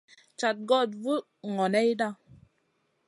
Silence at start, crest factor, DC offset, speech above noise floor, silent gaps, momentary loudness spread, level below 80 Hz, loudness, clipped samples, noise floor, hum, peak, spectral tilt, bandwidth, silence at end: 0.4 s; 18 dB; under 0.1%; 46 dB; none; 8 LU; -74 dBFS; -28 LUFS; under 0.1%; -73 dBFS; none; -10 dBFS; -5 dB/octave; 11.5 kHz; 0.95 s